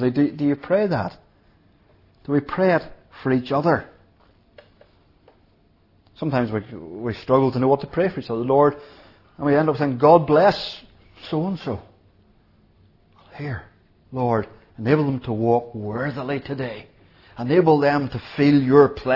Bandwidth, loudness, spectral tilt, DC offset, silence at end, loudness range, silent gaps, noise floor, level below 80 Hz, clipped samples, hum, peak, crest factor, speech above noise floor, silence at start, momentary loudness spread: 6 kHz; -21 LUFS; -9 dB/octave; under 0.1%; 0 s; 11 LU; none; -58 dBFS; -54 dBFS; under 0.1%; none; 0 dBFS; 22 dB; 39 dB; 0 s; 16 LU